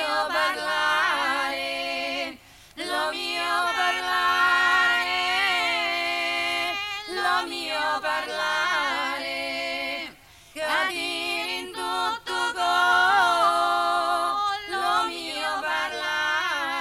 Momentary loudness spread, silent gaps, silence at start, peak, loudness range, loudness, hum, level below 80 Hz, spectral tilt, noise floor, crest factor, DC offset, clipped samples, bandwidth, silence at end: 9 LU; none; 0 s; -10 dBFS; 5 LU; -24 LUFS; none; -62 dBFS; -1 dB/octave; -47 dBFS; 16 dB; under 0.1%; under 0.1%; 16.5 kHz; 0 s